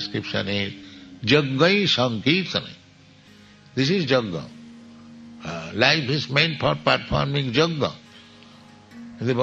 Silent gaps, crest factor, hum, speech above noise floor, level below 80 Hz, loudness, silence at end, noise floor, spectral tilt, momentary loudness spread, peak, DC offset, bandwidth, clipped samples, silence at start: none; 22 dB; none; 29 dB; -52 dBFS; -22 LUFS; 0 s; -51 dBFS; -5.5 dB/octave; 19 LU; -2 dBFS; under 0.1%; 8 kHz; under 0.1%; 0 s